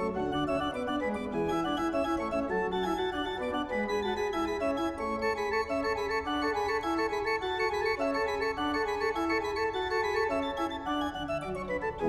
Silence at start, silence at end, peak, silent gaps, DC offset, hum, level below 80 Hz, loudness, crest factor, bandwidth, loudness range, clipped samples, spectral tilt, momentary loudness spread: 0 s; 0 s; -16 dBFS; none; under 0.1%; none; -52 dBFS; -31 LUFS; 14 dB; 14 kHz; 1 LU; under 0.1%; -5 dB/octave; 3 LU